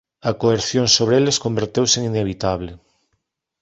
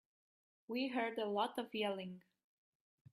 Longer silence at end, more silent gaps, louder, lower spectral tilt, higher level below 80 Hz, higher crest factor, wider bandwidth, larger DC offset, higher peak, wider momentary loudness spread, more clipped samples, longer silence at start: about the same, 0.85 s vs 0.95 s; neither; first, -18 LUFS vs -41 LUFS; second, -4 dB/octave vs -5.5 dB/octave; first, -46 dBFS vs -88 dBFS; about the same, 18 dB vs 20 dB; second, 8.4 kHz vs 14.5 kHz; neither; first, -2 dBFS vs -24 dBFS; about the same, 10 LU vs 10 LU; neither; second, 0.25 s vs 0.7 s